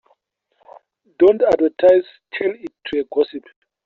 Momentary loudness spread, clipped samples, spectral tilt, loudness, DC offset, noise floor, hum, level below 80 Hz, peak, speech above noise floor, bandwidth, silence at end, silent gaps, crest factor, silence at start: 15 LU; under 0.1%; -3.5 dB/octave; -17 LUFS; under 0.1%; -65 dBFS; none; -58 dBFS; -2 dBFS; 48 dB; 6.8 kHz; 0.45 s; none; 16 dB; 1.2 s